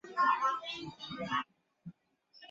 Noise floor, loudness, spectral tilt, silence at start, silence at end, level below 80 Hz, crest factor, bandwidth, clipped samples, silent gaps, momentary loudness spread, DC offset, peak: -66 dBFS; -34 LUFS; -1.5 dB/octave; 0.05 s; 0.05 s; -74 dBFS; 20 dB; 7.8 kHz; under 0.1%; none; 25 LU; under 0.1%; -18 dBFS